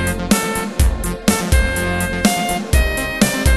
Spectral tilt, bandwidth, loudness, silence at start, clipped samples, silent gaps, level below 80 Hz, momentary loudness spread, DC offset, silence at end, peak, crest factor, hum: -4.5 dB/octave; 13.5 kHz; -17 LUFS; 0 s; under 0.1%; none; -20 dBFS; 3 LU; under 0.1%; 0 s; 0 dBFS; 16 dB; none